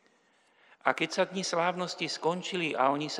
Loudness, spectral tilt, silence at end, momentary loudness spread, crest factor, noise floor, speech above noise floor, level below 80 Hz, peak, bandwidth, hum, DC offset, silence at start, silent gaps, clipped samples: -30 LUFS; -3.5 dB/octave; 0 s; 5 LU; 24 dB; -67 dBFS; 37 dB; -88 dBFS; -8 dBFS; 11.5 kHz; none; under 0.1%; 0.85 s; none; under 0.1%